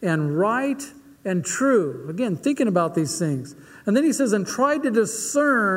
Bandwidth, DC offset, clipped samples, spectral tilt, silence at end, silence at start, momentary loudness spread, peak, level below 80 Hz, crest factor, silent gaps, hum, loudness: 16 kHz; under 0.1%; under 0.1%; -5 dB/octave; 0 s; 0 s; 10 LU; -6 dBFS; -66 dBFS; 16 dB; none; none; -22 LUFS